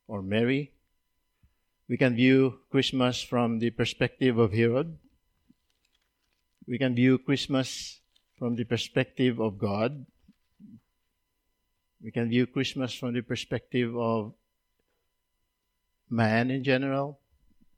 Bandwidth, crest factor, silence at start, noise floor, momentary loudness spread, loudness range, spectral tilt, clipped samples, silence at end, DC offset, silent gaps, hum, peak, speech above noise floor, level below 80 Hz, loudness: 11.5 kHz; 20 dB; 0.1 s; -79 dBFS; 12 LU; 7 LU; -6 dB/octave; under 0.1%; 0.65 s; under 0.1%; none; none; -10 dBFS; 52 dB; -64 dBFS; -28 LUFS